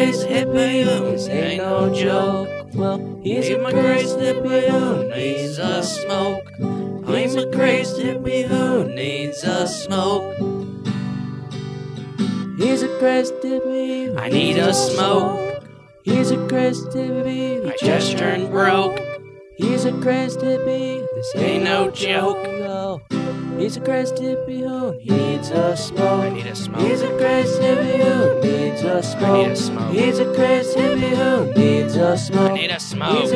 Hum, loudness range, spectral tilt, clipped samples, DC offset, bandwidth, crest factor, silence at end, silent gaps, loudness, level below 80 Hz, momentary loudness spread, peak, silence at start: none; 5 LU; -5.5 dB/octave; under 0.1%; under 0.1%; 11 kHz; 16 dB; 0 s; none; -20 LUFS; -54 dBFS; 8 LU; -2 dBFS; 0 s